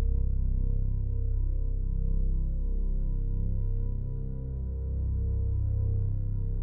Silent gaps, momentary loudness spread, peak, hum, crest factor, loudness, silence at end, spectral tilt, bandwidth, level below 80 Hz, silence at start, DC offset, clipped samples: none; 5 LU; -18 dBFS; none; 10 dB; -33 LUFS; 0 s; -15 dB/octave; 1 kHz; -28 dBFS; 0 s; under 0.1%; under 0.1%